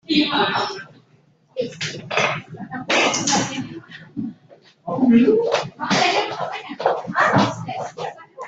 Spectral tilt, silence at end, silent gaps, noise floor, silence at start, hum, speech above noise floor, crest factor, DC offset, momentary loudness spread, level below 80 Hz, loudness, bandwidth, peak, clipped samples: -3.5 dB/octave; 0 s; none; -57 dBFS; 0.1 s; none; 39 dB; 18 dB; under 0.1%; 16 LU; -60 dBFS; -20 LUFS; 8.4 kHz; -4 dBFS; under 0.1%